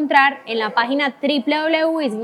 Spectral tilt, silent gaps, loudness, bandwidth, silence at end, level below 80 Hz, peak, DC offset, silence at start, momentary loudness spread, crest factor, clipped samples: -4.5 dB/octave; none; -18 LUFS; 12.5 kHz; 0 s; -78 dBFS; 0 dBFS; under 0.1%; 0 s; 6 LU; 18 dB; under 0.1%